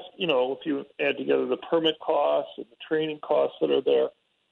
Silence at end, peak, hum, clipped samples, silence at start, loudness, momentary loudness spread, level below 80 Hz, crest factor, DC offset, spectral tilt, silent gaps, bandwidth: 0.4 s; -10 dBFS; none; under 0.1%; 0 s; -26 LUFS; 7 LU; -74 dBFS; 16 dB; under 0.1%; -7 dB/octave; none; 4.2 kHz